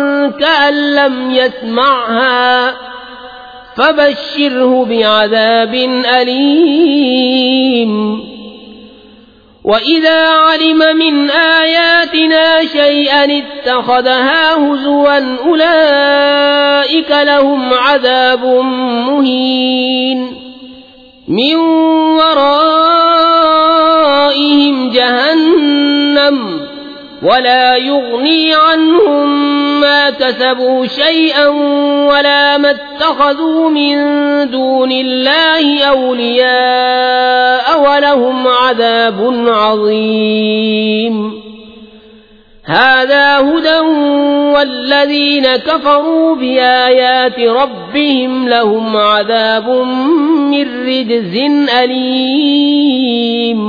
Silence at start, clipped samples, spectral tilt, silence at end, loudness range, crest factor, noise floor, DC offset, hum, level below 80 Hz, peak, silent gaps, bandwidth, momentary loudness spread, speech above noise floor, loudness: 0 s; under 0.1%; -5.5 dB/octave; 0 s; 4 LU; 10 dB; -41 dBFS; under 0.1%; none; -52 dBFS; 0 dBFS; none; 5 kHz; 5 LU; 32 dB; -9 LUFS